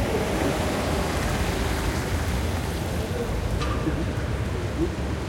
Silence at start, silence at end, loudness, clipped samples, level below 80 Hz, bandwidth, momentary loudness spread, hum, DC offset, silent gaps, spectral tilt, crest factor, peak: 0 s; 0 s; -26 LUFS; under 0.1%; -32 dBFS; 16.5 kHz; 3 LU; none; under 0.1%; none; -5.5 dB/octave; 14 dB; -12 dBFS